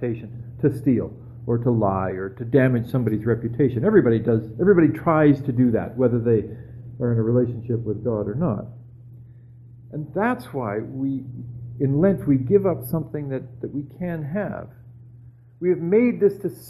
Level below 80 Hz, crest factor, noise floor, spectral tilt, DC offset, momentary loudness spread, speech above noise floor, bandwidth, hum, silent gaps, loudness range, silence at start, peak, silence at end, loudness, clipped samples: -50 dBFS; 18 dB; -47 dBFS; -10 dB/octave; under 0.1%; 14 LU; 25 dB; 13 kHz; none; none; 8 LU; 0 s; -4 dBFS; 0 s; -22 LUFS; under 0.1%